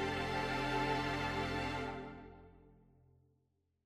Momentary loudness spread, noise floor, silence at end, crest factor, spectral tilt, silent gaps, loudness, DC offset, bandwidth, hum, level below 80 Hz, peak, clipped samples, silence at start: 15 LU; -80 dBFS; 1.15 s; 16 dB; -5 dB/octave; none; -38 LUFS; under 0.1%; 15 kHz; none; -56 dBFS; -24 dBFS; under 0.1%; 0 s